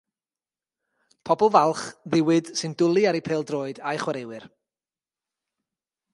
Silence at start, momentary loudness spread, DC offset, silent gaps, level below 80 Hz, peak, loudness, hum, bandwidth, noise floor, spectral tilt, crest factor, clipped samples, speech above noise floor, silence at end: 1.25 s; 14 LU; under 0.1%; none; -70 dBFS; -4 dBFS; -23 LUFS; none; 11.5 kHz; under -90 dBFS; -5.5 dB/octave; 22 dB; under 0.1%; over 67 dB; 1.65 s